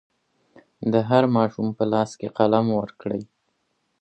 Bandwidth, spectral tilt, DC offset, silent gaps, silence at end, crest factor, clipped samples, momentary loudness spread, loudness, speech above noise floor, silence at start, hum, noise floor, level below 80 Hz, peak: 8.6 kHz; -7.5 dB/octave; under 0.1%; none; 0.8 s; 22 dB; under 0.1%; 11 LU; -22 LUFS; 51 dB; 0.8 s; none; -72 dBFS; -64 dBFS; -2 dBFS